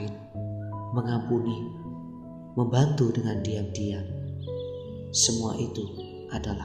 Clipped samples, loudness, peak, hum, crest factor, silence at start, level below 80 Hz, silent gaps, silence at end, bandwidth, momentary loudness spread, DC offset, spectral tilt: under 0.1%; -29 LUFS; -10 dBFS; none; 20 dB; 0 s; -52 dBFS; none; 0 s; 14 kHz; 15 LU; under 0.1%; -5 dB/octave